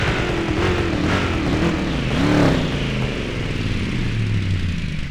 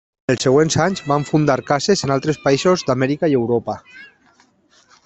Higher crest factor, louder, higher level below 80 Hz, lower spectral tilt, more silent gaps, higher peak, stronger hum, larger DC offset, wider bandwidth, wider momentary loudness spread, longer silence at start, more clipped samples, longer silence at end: about the same, 18 dB vs 18 dB; second, -21 LUFS vs -17 LUFS; first, -28 dBFS vs -52 dBFS; about the same, -6 dB/octave vs -5.5 dB/octave; neither; about the same, -2 dBFS vs 0 dBFS; neither; neither; first, 12.5 kHz vs 8.4 kHz; about the same, 7 LU vs 6 LU; second, 0 s vs 0.3 s; neither; second, 0 s vs 1 s